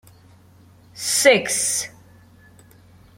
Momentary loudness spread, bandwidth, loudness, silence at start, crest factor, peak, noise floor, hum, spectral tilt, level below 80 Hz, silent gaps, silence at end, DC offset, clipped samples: 13 LU; 16.5 kHz; -18 LUFS; 0.95 s; 22 dB; -2 dBFS; -50 dBFS; none; -1 dB/octave; -62 dBFS; none; 1.3 s; under 0.1%; under 0.1%